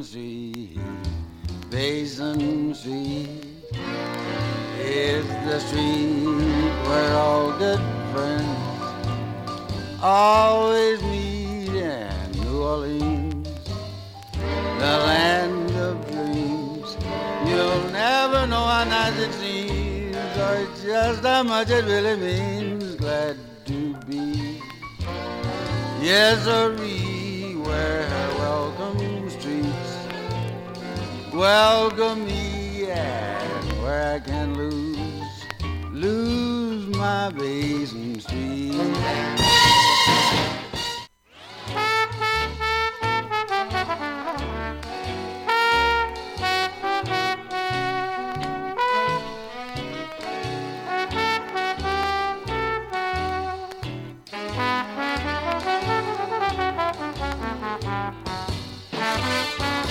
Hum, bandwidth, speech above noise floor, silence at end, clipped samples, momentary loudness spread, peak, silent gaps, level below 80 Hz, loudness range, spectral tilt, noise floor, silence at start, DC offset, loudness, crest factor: none; 17 kHz; 24 dB; 0 s; under 0.1%; 13 LU; -4 dBFS; none; -38 dBFS; 7 LU; -4.5 dB/octave; -45 dBFS; 0 s; under 0.1%; -23 LUFS; 18 dB